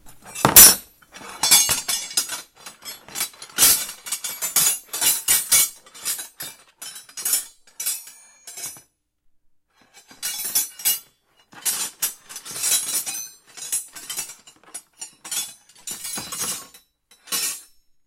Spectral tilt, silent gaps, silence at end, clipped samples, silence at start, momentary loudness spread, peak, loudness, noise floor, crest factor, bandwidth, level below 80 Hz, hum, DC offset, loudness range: 0.5 dB/octave; none; 0.45 s; under 0.1%; 0.05 s; 22 LU; 0 dBFS; -18 LUFS; -63 dBFS; 24 dB; 17 kHz; -54 dBFS; none; under 0.1%; 11 LU